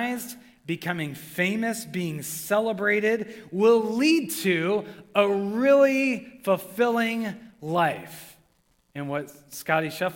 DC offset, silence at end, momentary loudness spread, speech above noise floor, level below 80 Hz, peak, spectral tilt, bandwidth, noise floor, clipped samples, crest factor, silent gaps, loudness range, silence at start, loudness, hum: under 0.1%; 0 s; 15 LU; 41 dB; -70 dBFS; -6 dBFS; -5 dB/octave; 17.5 kHz; -66 dBFS; under 0.1%; 18 dB; none; 6 LU; 0 s; -25 LUFS; none